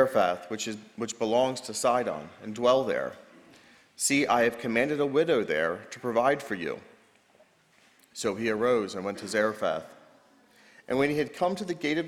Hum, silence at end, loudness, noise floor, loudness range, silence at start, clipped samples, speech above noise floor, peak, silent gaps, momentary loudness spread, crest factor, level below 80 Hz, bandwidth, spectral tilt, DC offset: none; 0 s; -28 LUFS; -63 dBFS; 4 LU; 0 s; under 0.1%; 35 dB; -10 dBFS; none; 11 LU; 20 dB; -66 dBFS; 16.5 kHz; -4 dB/octave; under 0.1%